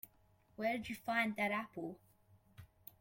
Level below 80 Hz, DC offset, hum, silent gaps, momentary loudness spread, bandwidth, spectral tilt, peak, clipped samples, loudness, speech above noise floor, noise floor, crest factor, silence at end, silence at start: -74 dBFS; under 0.1%; none; none; 22 LU; 16.5 kHz; -5 dB/octave; -24 dBFS; under 0.1%; -39 LUFS; 31 dB; -71 dBFS; 18 dB; 0.35 s; 0.05 s